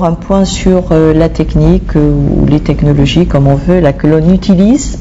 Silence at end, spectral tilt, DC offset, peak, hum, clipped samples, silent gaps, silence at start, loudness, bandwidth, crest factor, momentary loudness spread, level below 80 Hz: 0 s; -7 dB/octave; under 0.1%; 0 dBFS; none; 3%; none; 0 s; -9 LUFS; 8 kHz; 8 dB; 3 LU; -18 dBFS